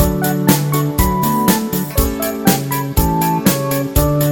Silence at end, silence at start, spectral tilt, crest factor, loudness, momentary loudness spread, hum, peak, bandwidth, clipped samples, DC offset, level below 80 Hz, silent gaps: 0 s; 0 s; -5 dB/octave; 16 dB; -16 LUFS; 4 LU; none; 0 dBFS; 17.5 kHz; under 0.1%; under 0.1%; -24 dBFS; none